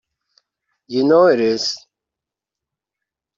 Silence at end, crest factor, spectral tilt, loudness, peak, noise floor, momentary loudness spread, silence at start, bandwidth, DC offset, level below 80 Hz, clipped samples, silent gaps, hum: 1.6 s; 18 dB; -4.5 dB/octave; -16 LUFS; -2 dBFS; -86 dBFS; 12 LU; 0.9 s; 7.6 kHz; under 0.1%; -64 dBFS; under 0.1%; none; none